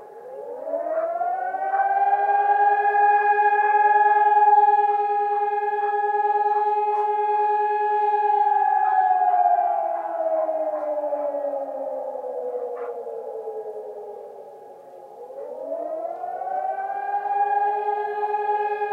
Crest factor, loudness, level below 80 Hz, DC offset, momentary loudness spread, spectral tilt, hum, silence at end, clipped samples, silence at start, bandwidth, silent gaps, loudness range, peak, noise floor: 14 dB; -22 LUFS; under -90 dBFS; under 0.1%; 16 LU; -4.5 dB/octave; none; 0 s; under 0.1%; 0 s; 4.4 kHz; none; 15 LU; -8 dBFS; -43 dBFS